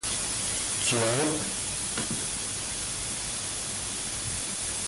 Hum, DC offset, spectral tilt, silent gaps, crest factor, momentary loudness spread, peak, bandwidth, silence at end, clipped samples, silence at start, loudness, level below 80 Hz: none; under 0.1%; -2 dB/octave; none; 16 dB; 6 LU; -14 dBFS; 12 kHz; 0 s; under 0.1%; 0 s; -28 LUFS; -50 dBFS